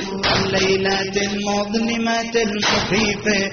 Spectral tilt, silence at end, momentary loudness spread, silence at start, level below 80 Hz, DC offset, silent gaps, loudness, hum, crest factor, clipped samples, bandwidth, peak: -2.5 dB/octave; 0 s; 4 LU; 0 s; -42 dBFS; under 0.1%; none; -19 LUFS; none; 16 dB; under 0.1%; 7 kHz; -4 dBFS